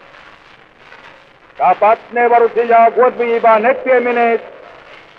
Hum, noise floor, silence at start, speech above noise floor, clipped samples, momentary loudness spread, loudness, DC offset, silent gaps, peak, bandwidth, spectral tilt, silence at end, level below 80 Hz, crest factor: none; -44 dBFS; 1.6 s; 32 dB; under 0.1%; 5 LU; -12 LUFS; under 0.1%; none; -2 dBFS; 5.6 kHz; -6.5 dB/octave; 0.7 s; -62 dBFS; 12 dB